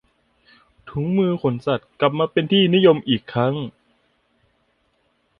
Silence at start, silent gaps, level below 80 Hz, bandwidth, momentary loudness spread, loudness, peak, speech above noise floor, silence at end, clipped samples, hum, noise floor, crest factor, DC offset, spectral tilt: 0.85 s; none; -58 dBFS; 5.6 kHz; 12 LU; -19 LUFS; -2 dBFS; 47 dB; 1.7 s; under 0.1%; none; -66 dBFS; 18 dB; under 0.1%; -9 dB/octave